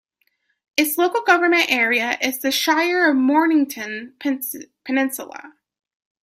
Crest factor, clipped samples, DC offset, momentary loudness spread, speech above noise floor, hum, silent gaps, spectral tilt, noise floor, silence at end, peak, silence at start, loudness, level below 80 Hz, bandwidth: 20 dB; under 0.1%; under 0.1%; 13 LU; 49 dB; none; none; -1.5 dB/octave; -68 dBFS; 0.75 s; 0 dBFS; 0.75 s; -19 LUFS; -70 dBFS; 16 kHz